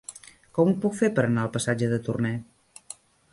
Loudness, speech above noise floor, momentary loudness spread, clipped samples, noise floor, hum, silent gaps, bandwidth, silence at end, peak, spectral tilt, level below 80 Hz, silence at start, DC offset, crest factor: -25 LUFS; 23 dB; 20 LU; under 0.1%; -48 dBFS; none; none; 11.5 kHz; 0.9 s; -8 dBFS; -6.5 dB/octave; -60 dBFS; 0.1 s; under 0.1%; 18 dB